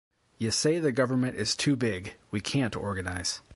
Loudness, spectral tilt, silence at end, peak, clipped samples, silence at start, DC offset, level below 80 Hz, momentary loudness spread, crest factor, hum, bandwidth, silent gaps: -29 LUFS; -4.5 dB/octave; 0 s; -12 dBFS; under 0.1%; 0.4 s; under 0.1%; -52 dBFS; 9 LU; 18 dB; none; 11.5 kHz; none